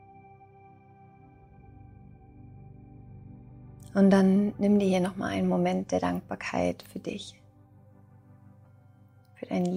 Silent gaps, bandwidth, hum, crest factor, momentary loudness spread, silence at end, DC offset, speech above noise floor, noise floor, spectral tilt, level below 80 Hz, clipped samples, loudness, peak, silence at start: none; 11.5 kHz; none; 20 dB; 28 LU; 0 s; under 0.1%; 31 dB; -57 dBFS; -7.5 dB/octave; -60 dBFS; under 0.1%; -27 LUFS; -8 dBFS; 2.45 s